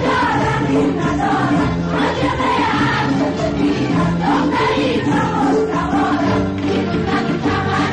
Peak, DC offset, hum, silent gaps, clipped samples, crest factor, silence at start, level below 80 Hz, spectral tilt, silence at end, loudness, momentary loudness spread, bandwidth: -8 dBFS; 0.2%; none; none; under 0.1%; 8 dB; 0 s; -36 dBFS; -6.5 dB/octave; 0 s; -17 LUFS; 2 LU; 10 kHz